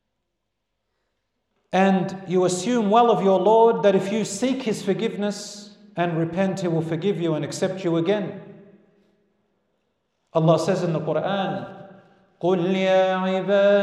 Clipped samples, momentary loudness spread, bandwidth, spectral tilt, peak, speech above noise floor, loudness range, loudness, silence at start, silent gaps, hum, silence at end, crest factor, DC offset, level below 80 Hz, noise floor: under 0.1%; 10 LU; 12.5 kHz; -6 dB/octave; -4 dBFS; 58 dB; 7 LU; -22 LUFS; 1.7 s; none; none; 0 s; 18 dB; under 0.1%; -70 dBFS; -79 dBFS